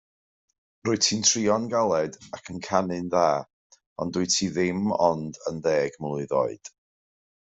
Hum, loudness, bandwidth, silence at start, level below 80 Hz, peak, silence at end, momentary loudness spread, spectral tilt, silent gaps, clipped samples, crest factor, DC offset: none; -25 LUFS; 8.2 kHz; 0.85 s; -64 dBFS; -6 dBFS; 0.75 s; 12 LU; -3.5 dB/octave; 3.53-3.70 s, 3.86-3.96 s; under 0.1%; 20 dB; under 0.1%